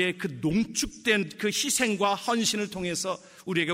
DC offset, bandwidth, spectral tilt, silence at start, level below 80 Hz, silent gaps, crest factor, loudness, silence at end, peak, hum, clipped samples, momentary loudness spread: under 0.1%; 16 kHz; -3 dB/octave; 0 s; -54 dBFS; none; 18 dB; -27 LUFS; 0 s; -10 dBFS; none; under 0.1%; 6 LU